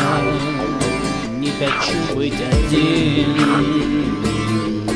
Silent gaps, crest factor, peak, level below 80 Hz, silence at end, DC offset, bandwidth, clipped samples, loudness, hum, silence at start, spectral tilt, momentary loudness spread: none; 14 dB; -4 dBFS; -30 dBFS; 0 s; under 0.1%; 11 kHz; under 0.1%; -18 LUFS; none; 0 s; -5.5 dB/octave; 5 LU